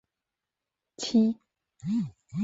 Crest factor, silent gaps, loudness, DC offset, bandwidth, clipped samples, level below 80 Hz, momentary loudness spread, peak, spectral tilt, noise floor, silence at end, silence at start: 18 dB; none; -28 LUFS; under 0.1%; 8 kHz; under 0.1%; -68 dBFS; 15 LU; -14 dBFS; -6 dB/octave; -88 dBFS; 0 s; 1 s